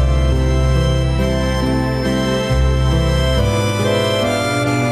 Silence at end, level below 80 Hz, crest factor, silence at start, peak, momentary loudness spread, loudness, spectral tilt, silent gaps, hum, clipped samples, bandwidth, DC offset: 0 s; -20 dBFS; 10 dB; 0 s; -4 dBFS; 2 LU; -16 LUFS; -6 dB/octave; none; none; under 0.1%; 13.5 kHz; under 0.1%